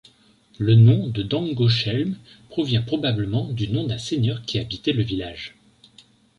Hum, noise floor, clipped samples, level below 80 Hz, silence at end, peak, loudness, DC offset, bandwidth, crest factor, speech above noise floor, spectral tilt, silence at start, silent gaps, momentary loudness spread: none; -56 dBFS; under 0.1%; -48 dBFS; 0.9 s; -4 dBFS; -22 LUFS; under 0.1%; 8.6 kHz; 18 dB; 35 dB; -7 dB/octave; 0.6 s; none; 13 LU